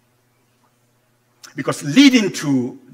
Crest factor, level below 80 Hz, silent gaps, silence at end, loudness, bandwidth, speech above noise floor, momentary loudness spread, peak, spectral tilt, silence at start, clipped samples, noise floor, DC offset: 20 dB; -70 dBFS; none; 0.15 s; -16 LUFS; 15.5 kHz; 45 dB; 15 LU; 0 dBFS; -4 dB/octave; 1.55 s; under 0.1%; -61 dBFS; under 0.1%